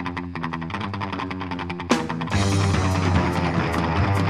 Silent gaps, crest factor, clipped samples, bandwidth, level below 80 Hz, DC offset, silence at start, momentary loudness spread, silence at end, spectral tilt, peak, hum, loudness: none; 20 dB; under 0.1%; 13 kHz; -38 dBFS; 0.2%; 0 s; 8 LU; 0 s; -6 dB/octave; -2 dBFS; none; -24 LUFS